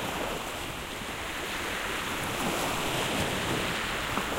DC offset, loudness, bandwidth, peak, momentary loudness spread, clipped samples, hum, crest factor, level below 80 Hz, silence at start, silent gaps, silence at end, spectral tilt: under 0.1%; -31 LUFS; 16 kHz; -14 dBFS; 6 LU; under 0.1%; none; 18 dB; -46 dBFS; 0 s; none; 0 s; -3 dB/octave